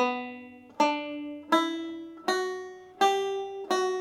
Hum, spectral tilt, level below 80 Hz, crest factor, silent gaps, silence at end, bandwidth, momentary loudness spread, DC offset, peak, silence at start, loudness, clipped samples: none; -2.5 dB/octave; -80 dBFS; 18 dB; none; 0 s; 16 kHz; 14 LU; under 0.1%; -10 dBFS; 0 s; -29 LUFS; under 0.1%